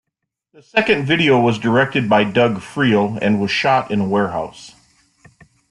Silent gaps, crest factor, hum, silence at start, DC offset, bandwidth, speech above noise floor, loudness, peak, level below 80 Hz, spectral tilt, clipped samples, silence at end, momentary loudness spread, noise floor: none; 16 dB; none; 0.75 s; under 0.1%; 11 kHz; 62 dB; -16 LUFS; -2 dBFS; -54 dBFS; -6 dB/octave; under 0.1%; 1 s; 5 LU; -79 dBFS